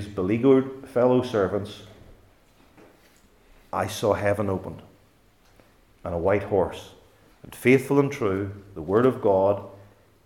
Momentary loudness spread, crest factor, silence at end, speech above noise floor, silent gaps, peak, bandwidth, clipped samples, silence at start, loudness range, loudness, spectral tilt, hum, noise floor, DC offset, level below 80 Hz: 19 LU; 20 dB; 0.5 s; 36 dB; none; -6 dBFS; 17 kHz; under 0.1%; 0 s; 6 LU; -24 LUFS; -7 dB/octave; none; -59 dBFS; under 0.1%; -58 dBFS